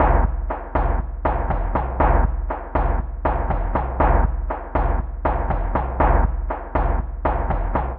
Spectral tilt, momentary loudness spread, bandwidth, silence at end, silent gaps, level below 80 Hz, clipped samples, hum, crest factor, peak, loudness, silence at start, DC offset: -8 dB/octave; 6 LU; 3.4 kHz; 0 s; none; -22 dBFS; under 0.1%; none; 16 dB; -4 dBFS; -23 LUFS; 0 s; under 0.1%